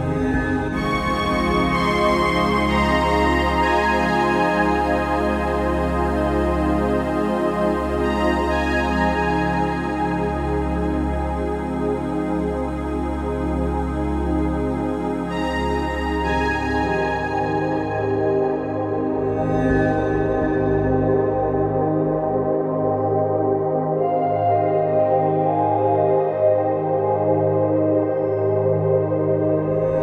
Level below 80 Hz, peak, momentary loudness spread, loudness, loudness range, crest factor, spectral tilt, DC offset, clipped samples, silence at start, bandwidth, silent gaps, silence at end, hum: -32 dBFS; -6 dBFS; 5 LU; -20 LUFS; 5 LU; 14 dB; -7 dB/octave; under 0.1%; under 0.1%; 0 s; 14 kHz; none; 0 s; none